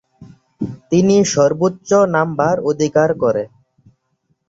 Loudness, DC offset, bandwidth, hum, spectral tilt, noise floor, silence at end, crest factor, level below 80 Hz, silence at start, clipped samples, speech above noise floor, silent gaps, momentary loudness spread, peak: -15 LUFS; under 0.1%; 8 kHz; none; -5.5 dB/octave; -66 dBFS; 1.05 s; 16 dB; -54 dBFS; 0.2 s; under 0.1%; 51 dB; none; 14 LU; -2 dBFS